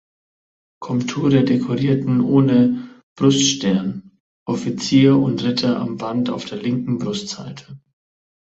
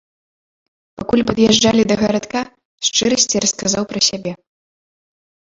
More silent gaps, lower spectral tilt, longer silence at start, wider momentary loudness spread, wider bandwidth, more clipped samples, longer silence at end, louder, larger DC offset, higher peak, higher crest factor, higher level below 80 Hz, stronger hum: first, 3.03-3.16 s, 4.20-4.46 s vs 2.65-2.78 s; first, -5.5 dB/octave vs -3 dB/octave; second, 0.8 s vs 1 s; about the same, 15 LU vs 13 LU; about the same, 8 kHz vs 7.8 kHz; neither; second, 0.7 s vs 1.2 s; second, -18 LUFS vs -15 LUFS; neither; about the same, -2 dBFS vs 0 dBFS; about the same, 18 dB vs 18 dB; second, -56 dBFS vs -48 dBFS; neither